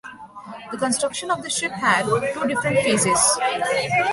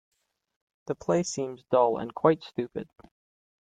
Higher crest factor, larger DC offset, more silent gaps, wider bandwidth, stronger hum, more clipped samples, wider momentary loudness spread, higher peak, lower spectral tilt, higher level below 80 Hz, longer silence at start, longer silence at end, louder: second, 18 dB vs 24 dB; neither; neither; first, 12 kHz vs 9.4 kHz; neither; neither; first, 18 LU vs 15 LU; about the same, -4 dBFS vs -6 dBFS; second, -2.5 dB/octave vs -5.5 dB/octave; first, -56 dBFS vs -66 dBFS; second, 0.05 s vs 0.85 s; second, 0 s vs 0.9 s; first, -20 LUFS vs -28 LUFS